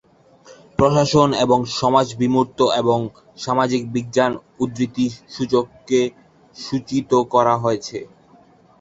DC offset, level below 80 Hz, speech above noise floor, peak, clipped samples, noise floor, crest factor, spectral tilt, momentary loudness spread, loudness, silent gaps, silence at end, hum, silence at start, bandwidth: under 0.1%; -50 dBFS; 32 dB; -2 dBFS; under 0.1%; -51 dBFS; 18 dB; -5.5 dB/octave; 11 LU; -19 LUFS; none; 0.75 s; none; 0.5 s; 8 kHz